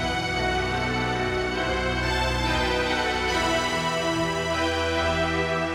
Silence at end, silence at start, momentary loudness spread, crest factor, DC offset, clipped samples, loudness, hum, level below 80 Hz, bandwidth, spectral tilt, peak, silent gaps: 0 s; 0 s; 2 LU; 14 dB; under 0.1%; under 0.1%; -24 LUFS; none; -36 dBFS; 16 kHz; -4 dB/octave; -10 dBFS; none